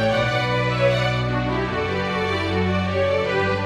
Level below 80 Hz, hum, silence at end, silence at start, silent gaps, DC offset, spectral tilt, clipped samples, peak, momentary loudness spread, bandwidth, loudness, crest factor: -40 dBFS; none; 0 s; 0 s; none; under 0.1%; -6.5 dB/octave; under 0.1%; -8 dBFS; 4 LU; 10.5 kHz; -21 LUFS; 14 dB